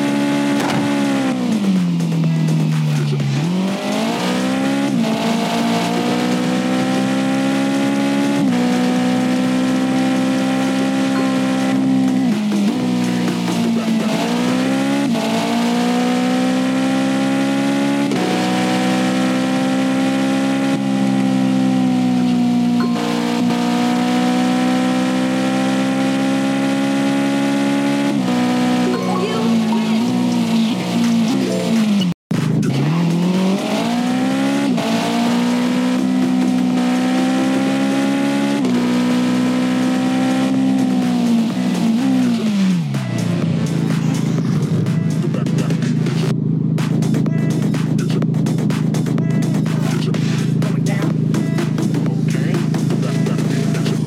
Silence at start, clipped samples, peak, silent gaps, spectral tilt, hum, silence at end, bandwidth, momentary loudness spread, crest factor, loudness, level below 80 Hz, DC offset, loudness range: 0 s; under 0.1%; -8 dBFS; 32.14-32.30 s; -6 dB/octave; none; 0 s; 15 kHz; 2 LU; 8 dB; -17 LUFS; -60 dBFS; under 0.1%; 1 LU